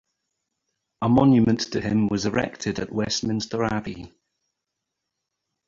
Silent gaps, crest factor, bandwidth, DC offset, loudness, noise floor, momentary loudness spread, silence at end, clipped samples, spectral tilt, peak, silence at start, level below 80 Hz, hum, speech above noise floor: none; 20 dB; 7.6 kHz; under 0.1%; -23 LUFS; -82 dBFS; 11 LU; 1.6 s; under 0.1%; -5.5 dB/octave; -4 dBFS; 1 s; -50 dBFS; none; 60 dB